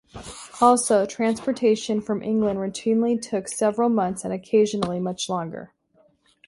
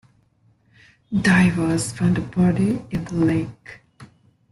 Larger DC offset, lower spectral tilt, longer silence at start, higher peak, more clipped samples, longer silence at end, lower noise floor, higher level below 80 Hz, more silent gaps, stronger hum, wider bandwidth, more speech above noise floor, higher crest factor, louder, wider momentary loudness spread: neither; second, -5 dB/octave vs -6.5 dB/octave; second, 0.15 s vs 1.1 s; about the same, -4 dBFS vs -6 dBFS; neither; first, 0.8 s vs 0.45 s; about the same, -62 dBFS vs -60 dBFS; second, -58 dBFS vs -48 dBFS; neither; neither; about the same, 11.5 kHz vs 12 kHz; about the same, 39 dB vs 40 dB; about the same, 20 dB vs 16 dB; second, -23 LUFS vs -20 LUFS; about the same, 11 LU vs 11 LU